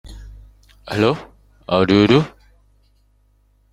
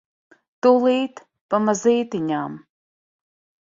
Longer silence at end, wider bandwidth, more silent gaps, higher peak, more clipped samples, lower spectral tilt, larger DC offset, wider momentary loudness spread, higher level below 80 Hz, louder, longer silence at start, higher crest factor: first, 1.45 s vs 1.05 s; first, 12.5 kHz vs 7.8 kHz; second, none vs 1.41-1.49 s; about the same, -2 dBFS vs -4 dBFS; neither; first, -7 dB/octave vs -5 dB/octave; neither; first, 20 LU vs 13 LU; first, -44 dBFS vs -68 dBFS; first, -17 LUFS vs -20 LUFS; second, 0.05 s vs 0.65 s; about the same, 18 dB vs 18 dB